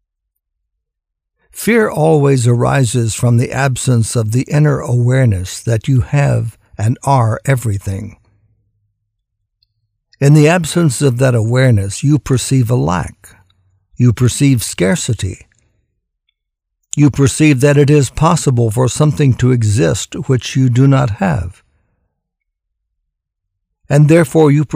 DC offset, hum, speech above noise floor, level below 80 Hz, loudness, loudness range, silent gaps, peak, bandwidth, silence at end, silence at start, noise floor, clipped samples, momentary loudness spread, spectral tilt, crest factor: under 0.1%; none; 66 dB; -40 dBFS; -13 LUFS; 5 LU; none; 0 dBFS; 16 kHz; 0 s; 1.55 s; -78 dBFS; under 0.1%; 10 LU; -6.5 dB/octave; 14 dB